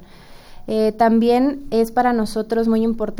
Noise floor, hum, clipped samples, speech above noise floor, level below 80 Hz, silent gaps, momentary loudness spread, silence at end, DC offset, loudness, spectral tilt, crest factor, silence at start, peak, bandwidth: -41 dBFS; none; under 0.1%; 24 dB; -40 dBFS; none; 6 LU; 0 s; under 0.1%; -18 LUFS; -6.5 dB/octave; 14 dB; 0 s; -4 dBFS; 16.5 kHz